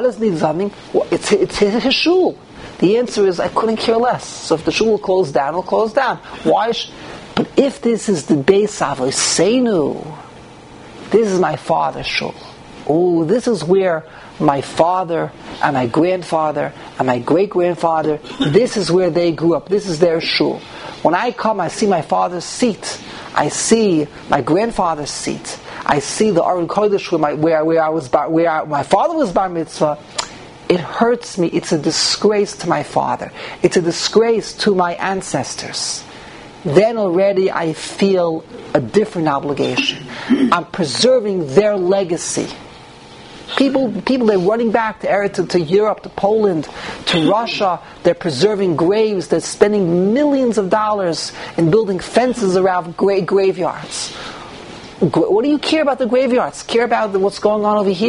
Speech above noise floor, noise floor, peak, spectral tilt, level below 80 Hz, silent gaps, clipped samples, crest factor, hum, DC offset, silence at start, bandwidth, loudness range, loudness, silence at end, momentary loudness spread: 22 dB; -38 dBFS; 0 dBFS; -4.5 dB/octave; -50 dBFS; none; under 0.1%; 16 dB; none; under 0.1%; 0 s; 11 kHz; 2 LU; -16 LUFS; 0 s; 9 LU